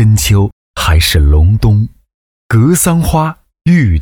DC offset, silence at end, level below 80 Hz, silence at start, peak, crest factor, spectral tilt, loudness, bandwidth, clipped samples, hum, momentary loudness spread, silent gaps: under 0.1%; 0 s; -18 dBFS; 0 s; 0 dBFS; 10 dB; -5 dB/octave; -11 LUFS; 19.5 kHz; under 0.1%; none; 8 LU; 0.53-0.74 s, 2.14-2.50 s